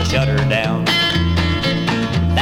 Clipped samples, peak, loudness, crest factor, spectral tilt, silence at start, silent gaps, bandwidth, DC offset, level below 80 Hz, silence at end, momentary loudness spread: under 0.1%; -2 dBFS; -16 LUFS; 14 dB; -5.5 dB/octave; 0 s; none; 16 kHz; under 0.1%; -28 dBFS; 0 s; 3 LU